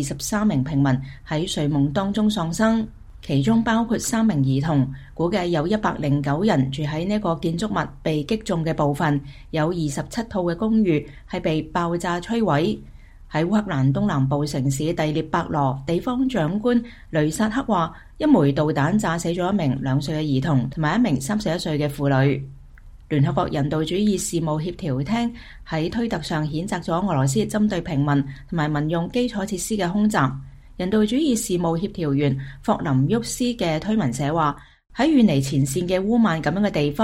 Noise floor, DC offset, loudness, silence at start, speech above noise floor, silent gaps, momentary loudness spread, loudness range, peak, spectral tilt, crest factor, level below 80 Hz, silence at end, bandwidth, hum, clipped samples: -43 dBFS; under 0.1%; -22 LUFS; 0 s; 22 dB; none; 6 LU; 2 LU; -4 dBFS; -6 dB/octave; 16 dB; -44 dBFS; 0 s; 16 kHz; none; under 0.1%